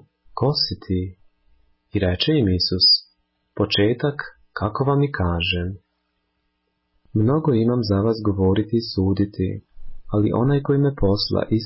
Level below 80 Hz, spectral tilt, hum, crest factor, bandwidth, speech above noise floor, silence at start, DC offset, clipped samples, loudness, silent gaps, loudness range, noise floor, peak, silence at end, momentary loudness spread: -38 dBFS; -9.5 dB/octave; none; 16 dB; 5.8 kHz; 52 dB; 0.35 s; under 0.1%; under 0.1%; -20 LUFS; none; 3 LU; -72 dBFS; -6 dBFS; 0 s; 9 LU